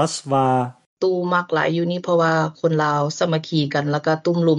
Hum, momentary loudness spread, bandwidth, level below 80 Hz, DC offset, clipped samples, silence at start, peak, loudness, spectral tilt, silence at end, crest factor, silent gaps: none; 4 LU; 11 kHz; -64 dBFS; under 0.1%; under 0.1%; 0 s; -6 dBFS; -20 LUFS; -6 dB/octave; 0 s; 14 dB; 0.86-0.97 s